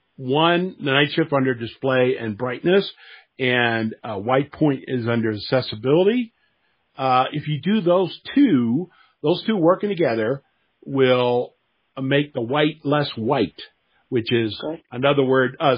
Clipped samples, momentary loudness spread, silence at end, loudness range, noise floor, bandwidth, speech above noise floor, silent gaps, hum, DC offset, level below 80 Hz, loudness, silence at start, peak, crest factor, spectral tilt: under 0.1%; 9 LU; 0 s; 2 LU; -67 dBFS; 5.2 kHz; 47 dB; none; none; under 0.1%; -64 dBFS; -21 LUFS; 0.2 s; 0 dBFS; 20 dB; -4.5 dB/octave